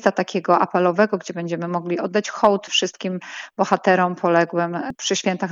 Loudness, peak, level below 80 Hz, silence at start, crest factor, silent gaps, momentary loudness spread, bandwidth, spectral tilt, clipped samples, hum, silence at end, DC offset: -20 LUFS; -2 dBFS; -66 dBFS; 0 s; 18 dB; none; 9 LU; 7.8 kHz; -4.5 dB/octave; under 0.1%; none; 0 s; under 0.1%